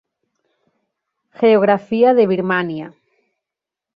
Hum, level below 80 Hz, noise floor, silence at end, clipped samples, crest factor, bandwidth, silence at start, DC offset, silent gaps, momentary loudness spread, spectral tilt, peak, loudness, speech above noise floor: none; -64 dBFS; -85 dBFS; 1.05 s; under 0.1%; 16 dB; 5.2 kHz; 1.4 s; under 0.1%; none; 14 LU; -9 dB/octave; -2 dBFS; -15 LUFS; 71 dB